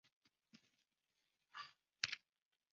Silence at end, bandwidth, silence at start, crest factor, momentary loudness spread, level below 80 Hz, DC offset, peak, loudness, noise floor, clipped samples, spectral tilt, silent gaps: 0.55 s; 7.4 kHz; 0.55 s; 40 dB; 14 LU; under -90 dBFS; under 0.1%; -16 dBFS; -48 LUFS; under -90 dBFS; under 0.1%; 2.5 dB/octave; none